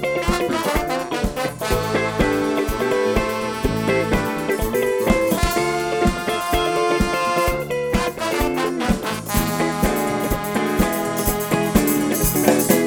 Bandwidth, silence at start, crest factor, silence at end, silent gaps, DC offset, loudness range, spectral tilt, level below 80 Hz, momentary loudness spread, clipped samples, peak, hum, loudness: over 20 kHz; 0 s; 18 dB; 0 s; none; under 0.1%; 1 LU; -4.5 dB/octave; -32 dBFS; 4 LU; under 0.1%; 0 dBFS; none; -20 LUFS